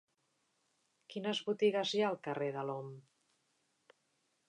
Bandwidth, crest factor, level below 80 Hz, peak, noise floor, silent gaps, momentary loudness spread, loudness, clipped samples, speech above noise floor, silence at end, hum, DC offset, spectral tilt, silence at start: 9.8 kHz; 20 dB; under -90 dBFS; -20 dBFS; -80 dBFS; none; 15 LU; -36 LUFS; under 0.1%; 44 dB; 1.5 s; none; under 0.1%; -5 dB/octave; 1.1 s